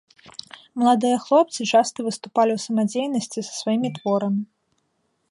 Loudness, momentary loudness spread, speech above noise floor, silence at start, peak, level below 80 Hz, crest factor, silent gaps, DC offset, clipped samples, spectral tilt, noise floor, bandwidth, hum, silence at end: -22 LUFS; 19 LU; 50 dB; 0.25 s; -6 dBFS; -72 dBFS; 16 dB; none; under 0.1%; under 0.1%; -5 dB/octave; -71 dBFS; 11.5 kHz; none; 0.85 s